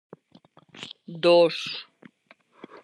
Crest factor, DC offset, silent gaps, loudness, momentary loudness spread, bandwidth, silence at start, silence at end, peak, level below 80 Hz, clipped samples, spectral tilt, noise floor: 18 dB; under 0.1%; none; -22 LUFS; 22 LU; 10 kHz; 0.75 s; 1 s; -8 dBFS; -84 dBFS; under 0.1%; -5 dB/octave; -60 dBFS